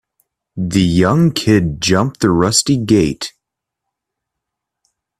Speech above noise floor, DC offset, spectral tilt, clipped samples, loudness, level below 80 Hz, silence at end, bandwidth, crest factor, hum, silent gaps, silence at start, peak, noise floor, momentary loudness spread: 66 dB; under 0.1%; -5 dB/octave; under 0.1%; -14 LUFS; -42 dBFS; 1.9 s; 15 kHz; 16 dB; none; none; 0.55 s; 0 dBFS; -79 dBFS; 12 LU